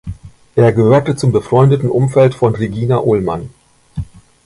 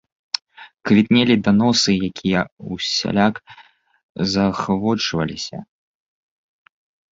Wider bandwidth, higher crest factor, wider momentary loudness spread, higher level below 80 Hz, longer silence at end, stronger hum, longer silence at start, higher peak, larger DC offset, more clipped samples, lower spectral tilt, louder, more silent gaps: first, 11.5 kHz vs 7.8 kHz; about the same, 14 dB vs 18 dB; first, 17 LU vs 14 LU; first, -38 dBFS vs -50 dBFS; second, 0.4 s vs 1.5 s; neither; second, 0.05 s vs 0.6 s; about the same, 0 dBFS vs -2 dBFS; neither; neither; first, -8 dB/octave vs -5 dB/octave; first, -13 LUFS vs -19 LUFS; second, none vs 2.52-2.57 s, 4.03-4.15 s